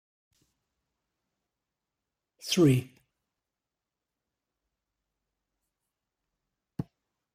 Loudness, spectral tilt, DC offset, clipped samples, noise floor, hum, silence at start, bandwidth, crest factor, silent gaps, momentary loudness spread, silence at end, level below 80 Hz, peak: -25 LUFS; -5.5 dB/octave; under 0.1%; under 0.1%; -89 dBFS; none; 2.45 s; 15.5 kHz; 24 dB; none; 20 LU; 0.5 s; -70 dBFS; -12 dBFS